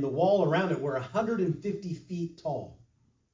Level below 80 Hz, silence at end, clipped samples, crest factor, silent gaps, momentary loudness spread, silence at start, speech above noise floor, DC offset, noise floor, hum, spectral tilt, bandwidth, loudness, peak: -66 dBFS; 0.6 s; under 0.1%; 18 dB; none; 12 LU; 0 s; 39 dB; under 0.1%; -68 dBFS; none; -7.5 dB/octave; 7.6 kHz; -30 LUFS; -12 dBFS